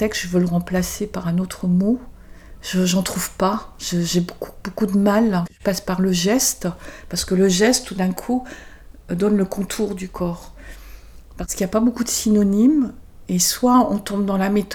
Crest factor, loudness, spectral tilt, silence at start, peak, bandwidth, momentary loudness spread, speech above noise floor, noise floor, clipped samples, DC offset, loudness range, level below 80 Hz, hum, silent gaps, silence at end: 16 dB; -20 LUFS; -5 dB/octave; 0 s; -4 dBFS; over 20 kHz; 12 LU; 21 dB; -40 dBFS; under 0.1%; under 0.1%; 5 LU; -42 dBFS; none; none; 0 s